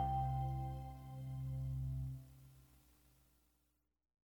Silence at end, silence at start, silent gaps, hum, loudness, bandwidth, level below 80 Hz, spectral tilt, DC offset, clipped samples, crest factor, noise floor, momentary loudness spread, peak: 1.45 s; 0 s; none; 60 Hz at -70 dBFS; -44 LUFS; 19.5 kHz; -52 dBFS; -8.5 dB/octave; under 0.1%; under 0.1%; 16 dB; -83 dBFS; 19 LU; -28 dBFS